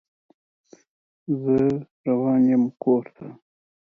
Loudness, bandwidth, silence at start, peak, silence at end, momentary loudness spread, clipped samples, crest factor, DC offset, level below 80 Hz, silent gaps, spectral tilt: -22 LUFS; 2.8 kHz; 1.3 s; -10 dBFS; 0.6 s; 22 LU; under 0.1%; 14 dB; under 0.1%; -62 dBFS; 1.91-2.04 s; -10.5 dB/octave